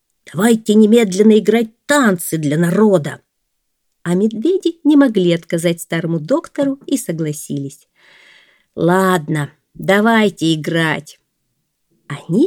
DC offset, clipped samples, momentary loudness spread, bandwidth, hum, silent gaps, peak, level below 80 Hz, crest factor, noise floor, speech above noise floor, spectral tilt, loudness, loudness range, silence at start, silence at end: under 0.1%; under 0.1%; 14 LU; 18.5 kHz; none; none; 0 dBFS; -64 dBFS; 16 dB; -71 dBFS; 56 dB; -5.5 dB/octave; -15 LUFS; 6 LU; 0.35 s; 0 s